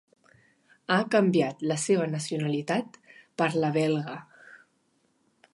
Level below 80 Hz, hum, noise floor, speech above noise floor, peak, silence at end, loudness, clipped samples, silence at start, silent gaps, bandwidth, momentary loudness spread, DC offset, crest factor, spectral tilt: -76 dBFS; none; -70 dBFS; 44 dB; -8 dBFS; 1 s; -27 LUFS; under 0.1%; 0.9 s; none; 11.5 kHz; 18 LU; under 0.1%; 20 dB; -5.5 dB/octave